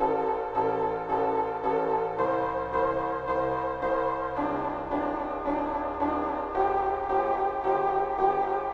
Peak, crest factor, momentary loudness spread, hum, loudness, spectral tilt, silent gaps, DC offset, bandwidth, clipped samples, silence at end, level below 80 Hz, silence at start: -10 dBFS; 16 dB; 4 LU; none; -28 LUFS; -8 dB/octave; none; under 0.1%; 7.2 kHz; under 0.1%; 0 s; -50 dBFS; 0 s